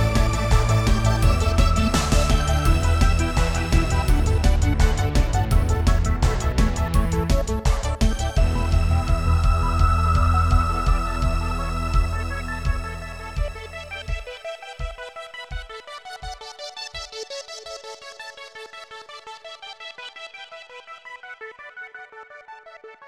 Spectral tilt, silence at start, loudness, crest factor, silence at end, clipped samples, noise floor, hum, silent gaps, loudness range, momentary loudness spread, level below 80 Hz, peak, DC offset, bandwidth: -5.5 dB/octave; 0 s; -22 LUFS; 16 dB; 0 s; under 0.1%; -44 dBFS; none; none; 17 LU; 18 LU; -24 dBFS; -4 dBFS; under 0.1%; 15 kHz